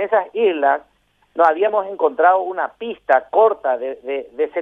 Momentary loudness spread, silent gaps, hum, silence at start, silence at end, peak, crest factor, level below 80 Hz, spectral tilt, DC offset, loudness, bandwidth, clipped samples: 10 LU; none; none; 0 s; 0 s; -2 dBFS; 16 dB; -66 dBFS; -5.5 dB/octave; under 0.1%; -18 LUFS; 4.5 kHz; under 0.1%